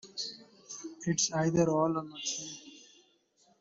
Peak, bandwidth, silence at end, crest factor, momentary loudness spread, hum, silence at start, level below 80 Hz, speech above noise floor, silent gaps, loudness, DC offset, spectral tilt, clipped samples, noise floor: -14 dBFS; 8 kHz; 0.8 s; 20 dB; 19 LU; none; 0.05 s; -68 dBFS; 38 dB; none; -31 LUFS; under 0.1%; -4 dB/octave; under 0.1%; -69 dBFS